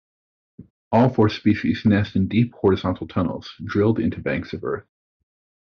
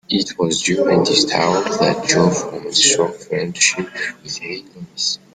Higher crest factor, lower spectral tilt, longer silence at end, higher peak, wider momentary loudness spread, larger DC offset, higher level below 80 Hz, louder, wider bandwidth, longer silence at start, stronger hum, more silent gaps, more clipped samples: about the same, 16 dB vs 18 dB; first, -6.5 dB/octave vs -3 dB/octave; first, 0.8 s vs 0.2 s; second, -4 dBFS vs 0 dBFS; second, 10 LU vs 13 LU; neither; about the same, -54 dBFS vs -54 dBFS; second, -21 LUFS vs -16 LUFS; second, 6.6 kHz vs 10 kHz; first, 0.6 s vs 0.1 s; neither; first, 0.70-0.91 s vs none; neither